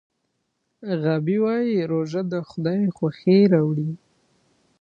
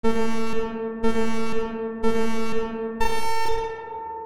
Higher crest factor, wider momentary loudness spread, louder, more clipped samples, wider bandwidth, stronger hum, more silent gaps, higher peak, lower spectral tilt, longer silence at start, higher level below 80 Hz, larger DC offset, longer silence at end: about the same, 18 dB vs 14 dB; first, 12 LU vs 5 LU; first, -22 LUFS vs -27 LUFS; neither; second, 7 kHz vs 19 kHz; neither; neither; about the same, -6 dBFS vs -6 dBFS; first, -9 dB/octave vs -5 dB/octave; first, 0.8 s vs 0.05 s; second, -66 dBFS vs -40 dBFS; second, under 0.1% vs 7%; first, 0.85 s vs 0 s